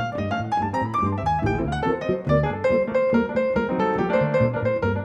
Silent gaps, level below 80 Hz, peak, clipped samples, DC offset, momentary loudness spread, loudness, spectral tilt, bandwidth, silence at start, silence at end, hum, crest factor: none; -40 dBFS; -8 dBFS; under 0.1%; under 0.1%; 3 LU; -23 LUFS; -8 dB/octave; 8.4 kHz; 0 s; 0 s; none; 14 dB